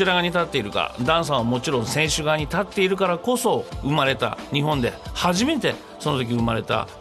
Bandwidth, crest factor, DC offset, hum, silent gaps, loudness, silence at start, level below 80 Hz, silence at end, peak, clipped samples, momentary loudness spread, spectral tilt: 13 kHz; 16 dB; under 0.1%; none; none; -22 LUFS; 0 s; -44 dBFS; 0 s; -6 dBFS; under 0.1%; 5 LU; -4.5 dB/octave